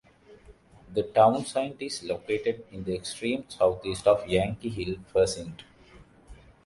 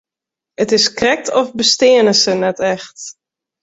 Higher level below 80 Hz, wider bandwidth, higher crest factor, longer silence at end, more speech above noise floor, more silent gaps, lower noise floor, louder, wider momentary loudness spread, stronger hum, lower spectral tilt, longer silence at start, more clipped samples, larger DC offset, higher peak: about the same, -52 dBFS vs -54 dBFS; first, 11.5 kHz vs 8 kHz; first, 20 dB vs 14 dB; second, 0.3 s vs 0.5 s; second, 27 dB vs 72 dB; neither; second, -54 dBFS vs -86 dBFS; second, -27 LUFS vs -13 LUFS; second, 12 LU vs 16 LU; neither; first, -5 dB/octave vs -2.5 dB/octave; second, 0.3 s vs 0.6 s; neither; neither; second, -8 dBFS vs -2 dBFS